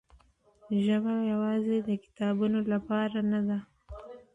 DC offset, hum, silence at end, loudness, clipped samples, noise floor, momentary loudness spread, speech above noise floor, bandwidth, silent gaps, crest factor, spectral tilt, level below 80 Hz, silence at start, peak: under 0.1%; none; 0.15 s; -30 LUFS; under 0.1%; -62 dBFS; 14 LU; 34 dB; 7.6 kHz; none; 12 dB; -8.5 dB/octave; -60 dBFS; 0.65 s; -18 dBFS